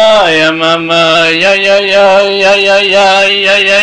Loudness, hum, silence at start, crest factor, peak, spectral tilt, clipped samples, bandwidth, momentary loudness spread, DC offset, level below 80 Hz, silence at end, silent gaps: -6 LUFS; none; 0 s; 6 dB; 0 dBFS; -3 dB/octave; under 0.1%; 10.5 kHz; 2 LU; under 0.1%; -46 dBFS; 0 s; none